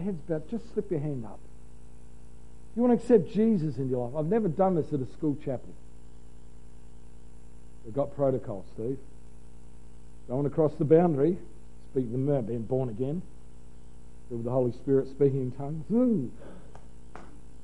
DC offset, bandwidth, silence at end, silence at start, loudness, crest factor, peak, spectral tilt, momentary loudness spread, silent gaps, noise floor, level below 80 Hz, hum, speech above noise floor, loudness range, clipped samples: 1%; 11.5 kHz; 0.05 s; 0 s; -29 LUFS; 22 dB; -8 dBFS; -10 dB/octave; 17 LU; none; -51 dBFS; -52 dBFS; 60 Hz at -55 dBFS; 24 dB; 8 LU; under 0.1%